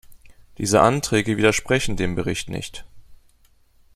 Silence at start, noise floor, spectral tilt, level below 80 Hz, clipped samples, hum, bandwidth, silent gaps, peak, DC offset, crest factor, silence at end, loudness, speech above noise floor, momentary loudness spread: 0.1 s; -57 dBFS; -4.5 dB/octave; -42 dBFS; under 0.1%; none; 15 kHz; none; -2 dBFS; under 0.1%; 22 dB; 0.8 s; -21 LUFS; 36 dB; 14 LU